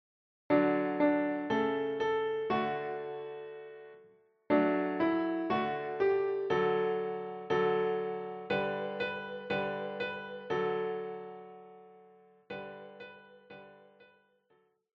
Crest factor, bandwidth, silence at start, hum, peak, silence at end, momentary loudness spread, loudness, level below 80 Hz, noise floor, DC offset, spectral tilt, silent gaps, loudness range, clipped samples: 20 dB; 6.2 kHz; 0.5 s; none; -14 dBFS; 1.25 s; 19 LU; -33 LUFS; -74 dBFS; -71 dBFS; under 0.1%; -4 dB/octave; none; 13 LU; under 0.1%